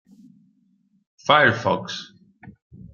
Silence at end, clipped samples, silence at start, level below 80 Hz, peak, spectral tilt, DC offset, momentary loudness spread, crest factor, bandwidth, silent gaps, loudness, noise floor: 0.05 s; under 0.1%; 1.25 s; -64 dBFS; 0 dBFS; -4.5 dB/octave; under 0.1%; 18 LU; 24 dB; 7.2 kHz; 2.62-2.70 s; -20 LUFS; -64 dBFS